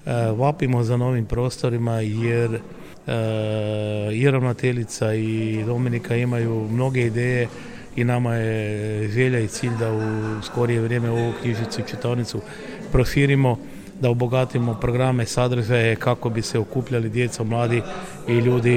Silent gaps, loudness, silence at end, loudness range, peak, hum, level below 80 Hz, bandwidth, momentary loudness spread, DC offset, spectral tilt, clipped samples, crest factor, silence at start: none; -22 LUFS; 0 s; 2 LU; -6 dBFS; none; -40 dBFS; 14 kHz; 7 LU; 0.2%; -6.5 dB/octave; under 0.1%; 16 dB; 0.05 s